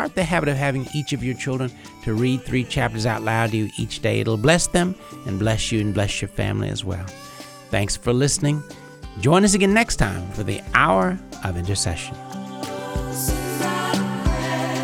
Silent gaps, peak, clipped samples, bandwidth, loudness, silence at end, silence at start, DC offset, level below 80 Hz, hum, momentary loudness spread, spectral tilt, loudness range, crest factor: none; -2 dBFS; under 0.1%; 17 kHz; -22 LUFS; 0 s; 0 s; under 0.1%; -36 dBFS; none; 13 LU; -4.5 dB/octave; 5 LU; 20 dB